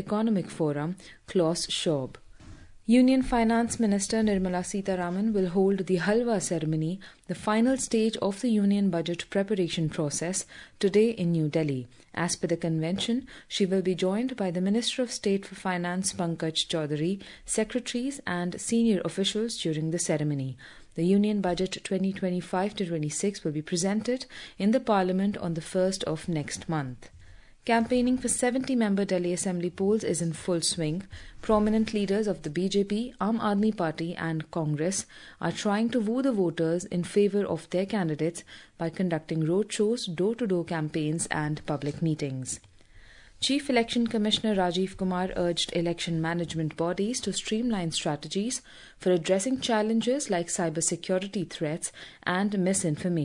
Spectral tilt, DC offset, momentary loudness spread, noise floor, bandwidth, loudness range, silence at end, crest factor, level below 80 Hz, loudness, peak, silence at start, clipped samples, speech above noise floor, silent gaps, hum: -5 dB/octave; under 0.1%; 7 LU; -52 dBFS; 11 kHz; 3 LU; 0 s; 18 dB; -54 dBFS; -28 LUFS; -10 dBFS; 0 s; under 0.1%; 25 dB; none; none